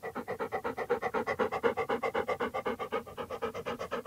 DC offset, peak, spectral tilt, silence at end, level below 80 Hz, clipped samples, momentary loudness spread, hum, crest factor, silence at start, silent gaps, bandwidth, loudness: under 0.1%; -14 dBFS; -5 dB/octave; 0 s; -64 dBFS; under 0.1%; 7 LU; none; 22 dB; 0 s; none; 16 kHz; -34 LUFS